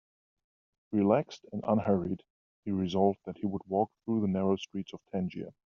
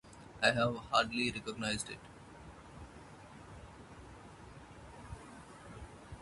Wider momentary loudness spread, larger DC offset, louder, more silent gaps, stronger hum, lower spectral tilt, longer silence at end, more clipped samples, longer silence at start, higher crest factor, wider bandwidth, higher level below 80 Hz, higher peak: second, 12 LU vs 22 LU; neither; about the same, -32 LUFS vs -34 LUFS; first, 2.30-2.63 s vs none; neither; first, -7.5 dB/octave vs -4 dB/octave; first, 0.2 s vs 0 s; neither; first, 0.9 s vs 0.05 s; second, 20 dB vs 28 dB; second, 7 kHz vs 11.5 kHz; second, -68 dBFS vs -60 dBFS; about the same, -12 dBFS vs -12 dBFS